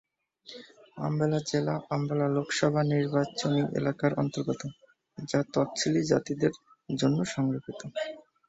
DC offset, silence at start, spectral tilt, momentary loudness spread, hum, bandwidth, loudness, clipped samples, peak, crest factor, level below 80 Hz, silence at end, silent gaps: under 0.1%; 0.45 s; -6 dB/octave; 16 LU; none; 8.2 kHz; -29 LUFS; under 0.1%; -10 dBFS; 20 dB; -66 dBFS; 0.3 s; none